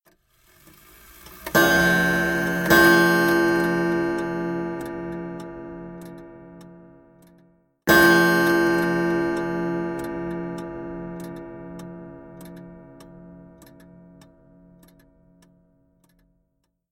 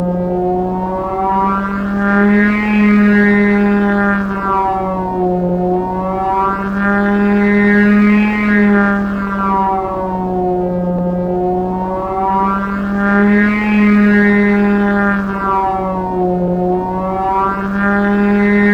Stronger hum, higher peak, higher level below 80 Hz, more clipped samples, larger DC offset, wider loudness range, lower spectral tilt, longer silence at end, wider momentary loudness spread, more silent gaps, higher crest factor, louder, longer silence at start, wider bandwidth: neither; about the same, -2 dBFS vs 0 dBFS; second, -50 dBFS vs -34 dBFS; neither; neither; first, 19 LU vs 3 LU; second, -5 dB/octave vs -9 dB/octave; first, 3.45 s vs 0 s; first, 24 LU vs 7 LU; neither; first, 22 dB vs 12 dB; second, -20 LUFS vs -13 LUFS; first, 1.25 s vs 0 s; first, 17 kHz vs 5.4 kHz